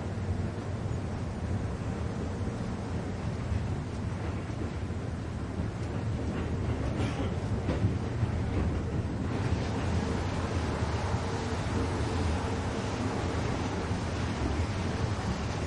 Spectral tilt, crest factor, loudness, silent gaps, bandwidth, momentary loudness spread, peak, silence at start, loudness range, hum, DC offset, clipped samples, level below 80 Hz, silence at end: -6.5 dB/octave; 16 dB; -33 LUFS; none; 11 kHz; 4 LU; -16 dBFS; 0 s; 3 LU; none; under 0.1%; under 0.1%; -42 dBFS; 0 s